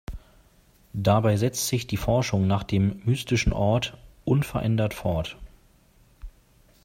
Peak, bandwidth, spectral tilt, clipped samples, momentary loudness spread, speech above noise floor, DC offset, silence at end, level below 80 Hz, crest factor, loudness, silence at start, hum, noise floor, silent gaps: -8 dBFS; 16 kHz; -6 dB/octave; under 0.1%; 14 LU; 35 dB; under 0.1%; 0.55 s; -40 dBFS; 18 dB; -25 LUFS; 0.1 s; none; -58 dBFS; none